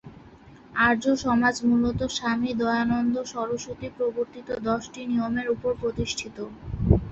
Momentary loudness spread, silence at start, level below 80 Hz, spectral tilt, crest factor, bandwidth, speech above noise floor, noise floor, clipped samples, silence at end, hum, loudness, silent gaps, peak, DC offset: 10 LU; 0.05 s; -40 dBFS; -5.5 dB/octave; 22 dB; 8 kHz; 24 dB; -49 dBFS; under 0.1%; 0 s; none; -26 LUFS; none; -4 dBFS; under 0.1%